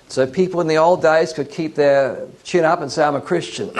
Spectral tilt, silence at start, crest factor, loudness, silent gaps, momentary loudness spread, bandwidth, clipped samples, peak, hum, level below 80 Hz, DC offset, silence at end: -5.5 dB/octave; 0.1 s; 14 dB; -17 LUFS; none; 8 LU; 11.5 kHz; under 0.1%; -2 dBFS; none; -60 dBFS; under 0.1%; 0 s